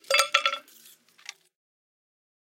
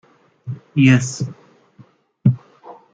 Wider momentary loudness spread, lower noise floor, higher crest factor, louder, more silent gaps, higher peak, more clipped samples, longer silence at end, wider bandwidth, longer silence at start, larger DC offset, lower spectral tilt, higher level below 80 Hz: first, 23 LU vs 19 LU; first, -56 dBFS vs -50 dBFS; first, 28 dB vs 18 dB; second, -24 LUFS vs -18 LUFS; neither; about the same, -4 dBFS vs -2 dBFS; neither; first, 1.85 s vs 0.2 s; first, 17 kHz vs 9.2 kHz; second, 0.1 s vs 0.45 s; neither; second, 3.5 dB/octave vs -6 dB/octave; second, -88 dBFS vs -54 dBFS